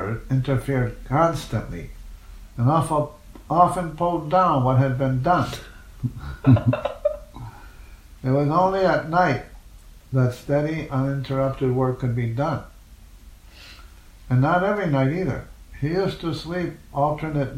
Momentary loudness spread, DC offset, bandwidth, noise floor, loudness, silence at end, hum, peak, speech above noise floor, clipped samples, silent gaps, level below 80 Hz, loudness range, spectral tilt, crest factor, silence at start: 13 LU; under 0.1%; 13.5 kHz; -46 dBFS; -22 LUFS; 0 s; none; -2 dBFS; 24 dB; under 0.1%; none; -42 dBFS; 4 LU; -7.5 dB/octave; 20 dB; 0 s